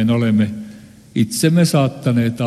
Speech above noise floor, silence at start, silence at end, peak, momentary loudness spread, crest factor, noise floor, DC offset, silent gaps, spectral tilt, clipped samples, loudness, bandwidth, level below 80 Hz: 24 dB; 0 s; 0 s; -2 dBFS; 12 LU; 14 dB; -39 dBFS; under 0.1%; none; -6 dB/octave; under 0.1%; -17 LUFS; 13 kHz; -54 dBFS